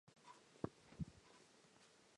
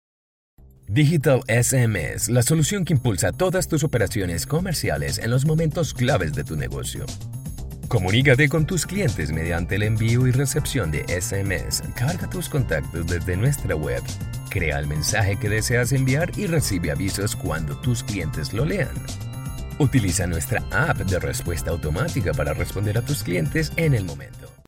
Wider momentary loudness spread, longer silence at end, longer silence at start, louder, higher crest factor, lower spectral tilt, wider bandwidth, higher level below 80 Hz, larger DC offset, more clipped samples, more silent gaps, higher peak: first, 16 LU vs 9 LU; second, 0 s vs 0.15 s; second, 0.05 s vs 0.6 s; second, -55 LUFS vs -23 LUFS; first, 28 dB vs 18 dB; first, -6.5 dB/octave vs -5 dB/octave; second, 11 kHz vs 16.5 kHz; second, -70 dBFS vs -36 dBFS; neither; neither; neither; second, -28 dBFS vs -4 dBFS